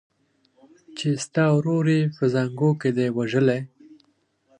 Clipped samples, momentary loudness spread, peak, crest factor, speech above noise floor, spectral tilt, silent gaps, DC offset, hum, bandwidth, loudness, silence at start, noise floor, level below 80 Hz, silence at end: under 0.1%; 9 LU; -6 dBFS; 16 dB; 45 dB; -7 dB/octave; none; under 0.1%; none; 10.5 kHz; -22 LUFS; 0.9 s; -67 dBFS; -68 dBFS; 0.95 s